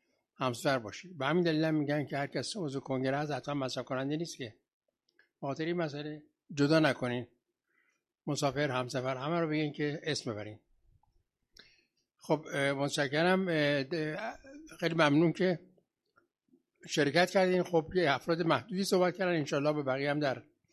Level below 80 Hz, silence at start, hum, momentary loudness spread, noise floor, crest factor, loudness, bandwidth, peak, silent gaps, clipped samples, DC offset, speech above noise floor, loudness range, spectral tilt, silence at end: -70 dBFS; 0.4 s; none; 13 LU; -77 dBFS; 22 dB; -32 LUFS; 13 kHz; -10 dBFS; 4.73-4.80 s; under 0.1%; under 0.1%; 46 dB; 7 LU; -5.5 dB/octave; 0.3 s